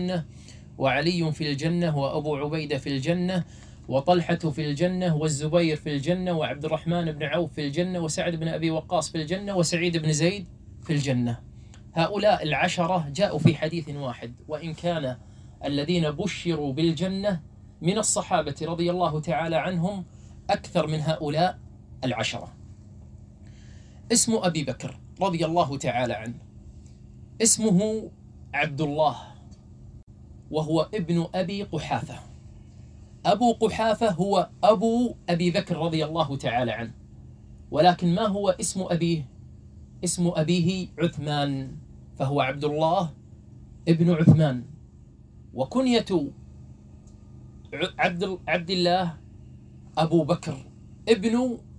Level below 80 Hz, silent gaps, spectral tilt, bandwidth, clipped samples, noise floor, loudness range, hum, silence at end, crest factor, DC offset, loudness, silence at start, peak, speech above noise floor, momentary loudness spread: -52 dBFS; 30.03-30.07 s; -5 dB/octave; 10.5 kHz; under 0.1%; -49 dBFS; 4 LU; none; 0 s; 22 dB; under 0.1%; -25 LUFS; 0 s; -4 dBFS; 25 dB; 12 LU